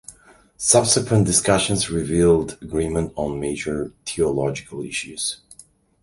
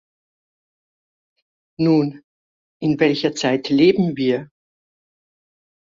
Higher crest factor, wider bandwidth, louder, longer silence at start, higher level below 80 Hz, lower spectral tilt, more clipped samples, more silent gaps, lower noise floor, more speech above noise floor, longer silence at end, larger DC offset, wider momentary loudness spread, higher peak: about the same, 22 dB vs 18 dB; first, 11.5 kHz vs 7.6 kHz; about the same, -20 LUFS vs -19 LUFS; second, 0.1 s vs 1.8 s; first, -42 dBFS vs -62 dBFS; second, -4 dB/octave vs -6 dB/octave; neither; second, none vs 2.24-2.80 s; second, -51 dBFS vs under -90 dBFS; second, 31 dB vs over 73 dB; second, 0.65 s vs 1.45 s; neither; about the same, 11 LU vs 9 LU; first, 0 dBFS vs -4 dBFS